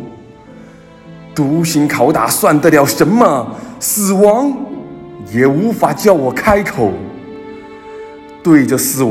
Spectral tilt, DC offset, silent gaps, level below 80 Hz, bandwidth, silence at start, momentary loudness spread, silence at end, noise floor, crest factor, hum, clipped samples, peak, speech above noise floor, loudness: -5 dB/octave; under 0.1%; none; -44 dBFS; 17 kHz; 0 s; 21 LU; 0 s; -37 dBFS; 14 dB; none; 0.4%; 0 dBFS; 26 dB; -12 LUFS